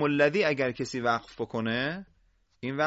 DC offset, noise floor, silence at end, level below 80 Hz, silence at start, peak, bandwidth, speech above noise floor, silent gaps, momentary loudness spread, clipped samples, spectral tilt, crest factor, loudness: under 0.1%; -67 dBFS; 0 s; -62 dBFS; 0 s; -10 dBFS; 8 kHz; 39 dB; none; 12 LU; under 0.1%; -5.5 dB/octave; 18 dB; -28 LUFS